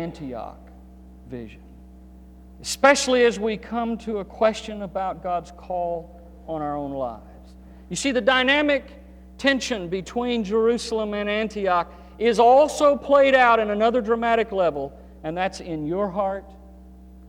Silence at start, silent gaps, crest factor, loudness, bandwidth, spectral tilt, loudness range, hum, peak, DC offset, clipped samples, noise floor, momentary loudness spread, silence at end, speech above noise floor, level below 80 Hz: 0 s; none; 20 dB; -22 LUFS; 15.5 kHz; -4 dB/octave; 9 LU; none; -4 dBFS; under 0.1%; under 0.1%; -45 dBFS; 18 LU; 0 s; 23 dB; -46 dBFS